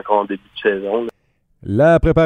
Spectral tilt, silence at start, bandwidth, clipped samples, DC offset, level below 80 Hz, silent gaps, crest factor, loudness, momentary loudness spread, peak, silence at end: -8 dB/octave; 0.05 s; 9 kHz; under 0.1%; under 0.1%; -30 dBFS; none; 16 dB; -17 LUFS; 15 LU; 0 dBFS; 0 s